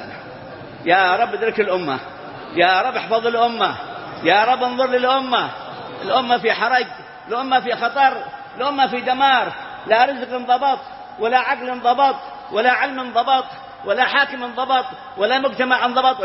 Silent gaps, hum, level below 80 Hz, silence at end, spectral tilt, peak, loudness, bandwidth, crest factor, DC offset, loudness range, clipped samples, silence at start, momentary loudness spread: none; none; -62 dBFS; 0 s; -7 dB/octave; -2 dBFS; -18 LUFS; 5.8 kHz; 18 dB; under 0.1%; 1 LU; under 0.1%; 0 s; 15 LU